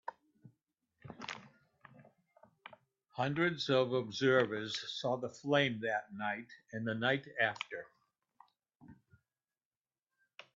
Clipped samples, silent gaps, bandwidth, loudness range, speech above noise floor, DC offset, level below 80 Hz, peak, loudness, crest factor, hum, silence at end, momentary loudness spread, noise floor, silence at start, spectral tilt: under 0.1%; 8.75-8.80 s; 7.8 kHz; 9 LU; over 55 dB; under 0.1%; -78 dBFS; -16 dBFS; -35 LUFS; 22 dB; none; 1.6 s; 19 LU; under -90 dBFS; 0.05 s; -3 dB/octave